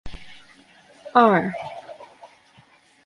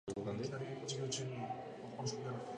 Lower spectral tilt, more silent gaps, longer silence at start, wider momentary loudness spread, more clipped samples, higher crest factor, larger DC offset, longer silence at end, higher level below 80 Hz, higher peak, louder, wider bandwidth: first, -7 dB/octave vs -4.5 dB/octave; neither; about the same, 0.05 s vs 0.05 s; first, 27 LU vs 5 LU; neither; first, 22 dB vs 14 dB; neither; first, 0.8 s vs 0 s; first, -52 dBFS vs -72 dBFS; first, -2 dBFS vs -28 dBFS; first, -20 LUFS vs -43 LUFS; about the same, 11 kHz vs 10.5 kHz